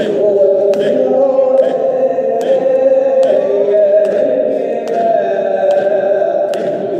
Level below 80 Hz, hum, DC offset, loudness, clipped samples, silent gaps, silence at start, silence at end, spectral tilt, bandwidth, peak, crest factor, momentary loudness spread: -76 dBFS; none; under 0.1%; -12 LUFS; under 0.1%; none; 0 s; 0 s; -6.5 dB/octave; 8.8 kHz; 0 dBFS; 10 dB; 4 LU